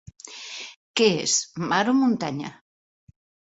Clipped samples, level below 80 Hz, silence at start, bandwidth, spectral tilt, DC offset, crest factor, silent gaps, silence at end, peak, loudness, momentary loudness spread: under 0.1%; -64 dBFS; 0.25 s; 8.2 kHz; -3 dB/octave; under 0.1%; 20 dB; 0.76-0.94 s; 1 s; -6 dBFS; -23 LUFS; 18 LU